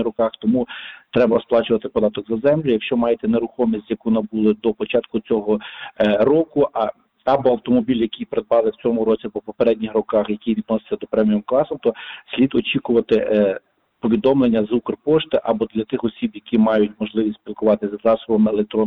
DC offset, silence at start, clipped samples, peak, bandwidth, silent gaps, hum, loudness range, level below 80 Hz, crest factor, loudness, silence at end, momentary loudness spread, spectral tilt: under 0.1%; 0 s; under 0.1%; -6 dBFS; 4.8 kHz; none; none; 2 LU; -52 dBFS; 12 dB; -19 LUFS; 0 s; 7 LU; -9 dB/octave